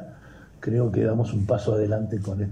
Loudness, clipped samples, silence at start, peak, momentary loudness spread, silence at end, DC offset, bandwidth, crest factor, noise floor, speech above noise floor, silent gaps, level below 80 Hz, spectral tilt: -25 LUFS; under 0.1%; 0 s; -10 dBFS; 6 LU; 0 s; under 0.1%; 8.8 kHz; 14 dB; -47 dBFS; 24 dB; none; -54 dBFS; -9 dB/octave